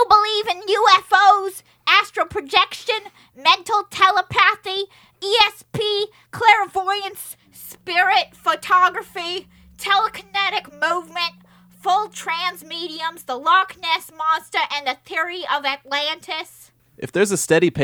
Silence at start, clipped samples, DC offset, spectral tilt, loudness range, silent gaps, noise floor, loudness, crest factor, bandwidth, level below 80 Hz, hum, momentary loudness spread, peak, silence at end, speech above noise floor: 0 s; under 0.1%; under 0.1%; -2.5 dB/octave; 5 LU; none; -42 dBFS; -19 LUFS; 20 dB; over 20 kHz; -60 dBFS; none; 14 LU; 0 dBFS; 0 s; 22 dB